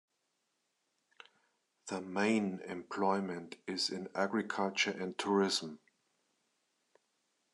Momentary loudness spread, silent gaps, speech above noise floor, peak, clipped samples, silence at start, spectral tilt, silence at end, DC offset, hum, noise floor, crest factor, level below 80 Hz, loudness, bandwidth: 12 LU; none; 47 dB; -18 dBFS; under 0.1%; 1.85 s; -4 dB/octave; 1.75 s; under 0.1%; none; -82 dBFS; 20 dB; -90 dBFS; -35 LUFS; 12 kHz